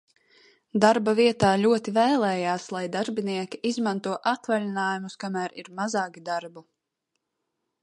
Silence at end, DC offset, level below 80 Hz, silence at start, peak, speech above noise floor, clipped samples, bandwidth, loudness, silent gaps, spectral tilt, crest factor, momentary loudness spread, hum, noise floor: 1.2 s; under 0.1%; -64 dBFS; 0.75 s; -2 dBFS; 56 dB; under 0.1%; 11 kHz; -25 LUFS; none; -5 dB/octave; 24 dB; 12 LU; none; -81 dBFS